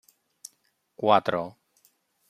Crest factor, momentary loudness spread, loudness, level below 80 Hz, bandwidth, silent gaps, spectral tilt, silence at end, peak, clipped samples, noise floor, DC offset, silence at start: 24 dB; 25 LU; -25 LUFS; -74 dBFS; 15.5 kHz; none; -5 dB/octave; 0.8 s; -6 dBFS; under 0.1%; -70 dBFS; under 0.1%; 1 s